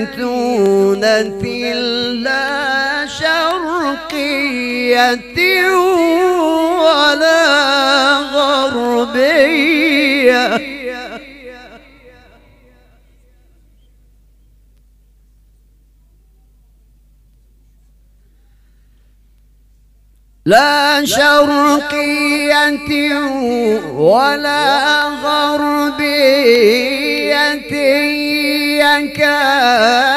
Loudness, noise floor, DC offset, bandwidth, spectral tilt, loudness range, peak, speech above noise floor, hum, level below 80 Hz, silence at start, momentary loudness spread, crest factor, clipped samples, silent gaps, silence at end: -12 LUFS; -49 dBFS; under 0.1%; 15.5 kHz; -3 dB/octave; 5 LU; 0 dBFS; 36 dB; none; -48 dBFS; 0 s; 7 LU; 14 dB; under 0.1%; none; 0 s